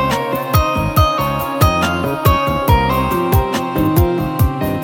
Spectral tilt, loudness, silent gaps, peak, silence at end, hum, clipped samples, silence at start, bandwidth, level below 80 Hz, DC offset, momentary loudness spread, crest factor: -6 dB/octave; -15 LUFS; none; 0 dBFS; 0 s; none; under 0.1%; 0 s; 17 kHz; -24 dBFS; under 0.1%; 3 LU; 14 dB